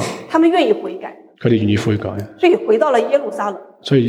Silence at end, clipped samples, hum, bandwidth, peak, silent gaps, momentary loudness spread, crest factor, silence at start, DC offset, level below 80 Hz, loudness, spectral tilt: 0 s; under 0.1%; none; 12.5 kHz; -2 dBFS; none; 13 LU; 14 dB; 0 s; under 0.1%; -56 dBFS; -16 LUFS; -6.5 dB/octave